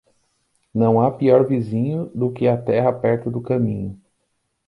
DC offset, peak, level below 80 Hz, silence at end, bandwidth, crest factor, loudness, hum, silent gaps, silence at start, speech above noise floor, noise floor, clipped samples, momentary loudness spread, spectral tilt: under 0.1%; -2 dBFS; -54 dBFS; 0.75 s; 5.4 kHz; 18 dB; -20 LUFS; none; none; 0.75 s; 53 dB; -71 dBFS; under 0.1%; 8 LU; -10.5 dB/octave